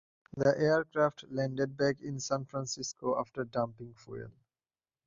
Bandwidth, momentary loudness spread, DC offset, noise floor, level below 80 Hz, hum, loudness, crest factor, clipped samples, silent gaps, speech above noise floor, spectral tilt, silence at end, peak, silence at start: 7.8 kHz; 17 LU; under 0.1%; under -90 dBFS; -68 dBFS; none; -33 LUFS; 20 dB; under 0.1%; none; over 57 dB; -5 dB/octave; 0.75 s; -14 dBFS; 0.35 s